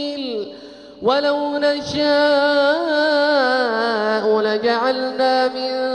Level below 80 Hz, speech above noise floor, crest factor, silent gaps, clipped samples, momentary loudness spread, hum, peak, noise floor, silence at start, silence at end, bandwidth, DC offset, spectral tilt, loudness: -58 dBFS; 21 dB; 14 dB; none; under 0.1%; 9 LU; none; -4 dBFS; -38 dBFS; 0 s; 0 s; 10 kHz; under 0.1%; -4 dB/octave; -18 LUFS